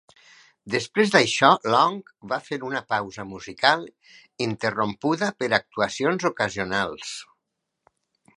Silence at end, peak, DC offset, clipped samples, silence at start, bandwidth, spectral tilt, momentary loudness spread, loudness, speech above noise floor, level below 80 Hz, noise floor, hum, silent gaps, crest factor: 1.15 s; 0 dBFS; under 0.1%; under 0.1%; 0.65 s; 11.5 kHz; -4 dB/octave; 16 LU; -23 LUFS; 56 dB; -62 dBFS; -80 dBFS; none; none; 24 dB